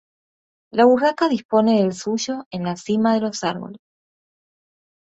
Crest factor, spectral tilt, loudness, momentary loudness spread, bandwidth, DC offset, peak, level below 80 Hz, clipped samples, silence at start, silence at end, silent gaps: 18 dB; -5.5 dB/octave; -20 LUFS; 11 LU; 8.2 kHz; under 0.1%; -2 dBFS; -64 dBFS; under 0.1%; 0.75 s; 1.3 s; 1.45-1.49 s, 2.46-2.51 s